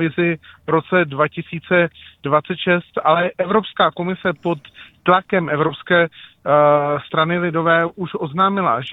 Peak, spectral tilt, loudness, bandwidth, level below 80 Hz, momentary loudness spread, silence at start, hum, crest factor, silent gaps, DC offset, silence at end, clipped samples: 0 dBFS; -9 dB/octave; -18 LUFS; 4.1 kHz; -58 dBFS; 8 LU; 0 s; none; 18 dB; none; under 0.1%; 0 s; under 0.1%